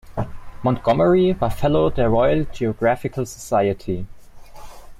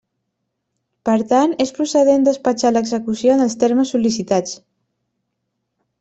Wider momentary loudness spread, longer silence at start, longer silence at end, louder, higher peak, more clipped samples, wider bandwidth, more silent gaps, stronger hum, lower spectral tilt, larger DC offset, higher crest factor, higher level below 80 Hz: first, 13 LU vs 6 LU; second, 0.05 s vs 1.05 s; second, 0.05 s vs 1.45 s; second, -20 LUFS vs -17 LUFS; about the same, -6 dBFS vs -4 dBFS; neither; first, 15.5 kHz vs 8.2 kHz; neither; neither; first, -7 dB/octave vs -5 dB/octave; neither; about the same, 12 dB vs 16 dB; first, -36 dBFS vs -60 dBFS